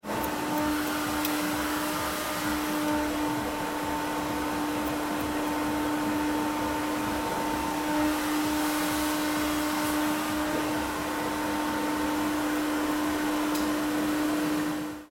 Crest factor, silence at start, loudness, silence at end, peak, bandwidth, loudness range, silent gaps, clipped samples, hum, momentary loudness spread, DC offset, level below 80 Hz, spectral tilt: 16 dB; 0.05 s; -28 LUFS; 0.05 s; -12 dBFS; 17 kHz; 2 LU; none; under 0.1%; none; 3 LU; under 0.1%; -50 dBFS; -3.5 dB/octave